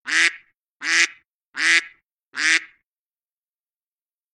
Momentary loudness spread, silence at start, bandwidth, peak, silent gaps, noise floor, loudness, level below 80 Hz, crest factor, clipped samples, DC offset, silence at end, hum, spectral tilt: 12 LU; 0.05 s; 12.5 kHz; 0 dBFS; 0.59-0.80 s, 1.31-1.53 s, 2.12-2.16 s, 2.23-2.32 s; under -90 dBFS; -19 LUFS; -82 dBFS; 24 dB; under 0.1%; under 0.1%; 1.7 s; none; 3 dB/octave